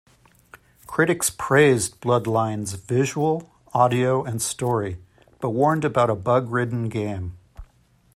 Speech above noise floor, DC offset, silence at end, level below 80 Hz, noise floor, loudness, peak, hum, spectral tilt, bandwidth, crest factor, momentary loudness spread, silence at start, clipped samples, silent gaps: 37 dB; under 0.1%; 0.55 s; -54 dBFS; -58 dBFS; -22 LUFS; -4 dBFS; none; -5 dB/octave; 16 kHz; 20 dB; 11 LU; 0.9 s; under 0.1%; none